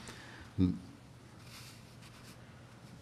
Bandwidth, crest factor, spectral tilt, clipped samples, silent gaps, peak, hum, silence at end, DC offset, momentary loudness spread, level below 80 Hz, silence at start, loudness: 14.5 kHz; 24 dB; -6.5 dB/octave; under 0.1%; none; -18 dBFS; none; 0 s; under 0.1%; 21 LU; -66 dBFS; 0 s; -38 LUFS